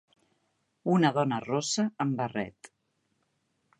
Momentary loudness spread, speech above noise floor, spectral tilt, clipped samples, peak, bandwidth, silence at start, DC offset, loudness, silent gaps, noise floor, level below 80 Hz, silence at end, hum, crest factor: 12 LU; 48 dB; -5 dB/octave; under 0.1%; -10 dBFS; 11.5 kHz; 0.85 s; under 0.1%; -29 LUFS; none; -76 dBFS; -72 dBFS; 1.3 s; none; 22 dB